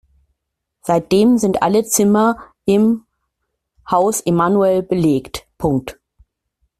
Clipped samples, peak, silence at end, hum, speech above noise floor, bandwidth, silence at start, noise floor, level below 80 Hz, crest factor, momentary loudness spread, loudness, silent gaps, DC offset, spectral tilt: under 0.1%; -2 dBFS; 0.9 s; none; 62 dB; 14.5 kHz; 0.85 s; -77 dBFS; -48 dBFS; 16 dB; 9 LU; -16 LUFS; none; under 0.1%; -5.5 dB/octave